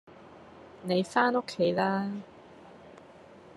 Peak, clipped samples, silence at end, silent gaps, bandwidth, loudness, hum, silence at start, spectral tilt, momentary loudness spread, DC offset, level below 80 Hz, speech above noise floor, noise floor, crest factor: -10 dBFS; under 0.1%; 0.2 s; none; 12 kHz; -28 LUFS; none; 0.15 s; -6 dB/octave; 25 LU; under 0.1%; -74 dBFS; 24 dB; -52 dBFS; 22 dB